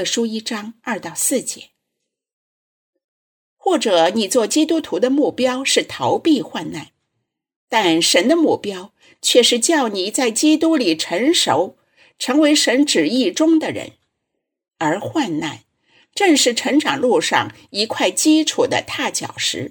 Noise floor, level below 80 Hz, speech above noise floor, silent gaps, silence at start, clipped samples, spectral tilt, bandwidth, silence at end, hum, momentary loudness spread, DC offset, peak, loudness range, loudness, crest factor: -78 dBFS; -66 dBFS; 61 dB; 2.33-2.93 s, 3.04-3.56 s, 7.56-7.68 s; 0 s; under 0.1%; -2.5 dB/octave; 19 kHz; 0 s; none; 13 LU; under 0.1%; 0 dBFS; 5 LU; -17 LUFS; 18 dB